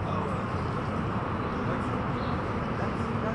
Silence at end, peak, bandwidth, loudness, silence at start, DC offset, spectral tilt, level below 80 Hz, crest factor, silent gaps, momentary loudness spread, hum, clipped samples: 0 s; -18 dBFS; 11 kHz; -31 LUFS; 0 s; under 0.1%; -8 dB/octave; -44 dBFS; 12 dB; none; 1 LU; none; under 0.1%